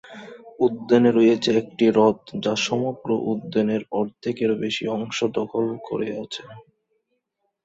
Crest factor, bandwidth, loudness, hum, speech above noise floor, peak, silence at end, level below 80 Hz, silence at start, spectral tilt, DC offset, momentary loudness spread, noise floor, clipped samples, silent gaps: 18 dB; 8 kHz; -22 LUFS; none; 54 dB; -4 dBFS; 1.05 s; -64 dBFS; 0.05 s; -5.5 dB/octave; under 0.1%; 11 LU; -76 dBFS; under 0.1%; none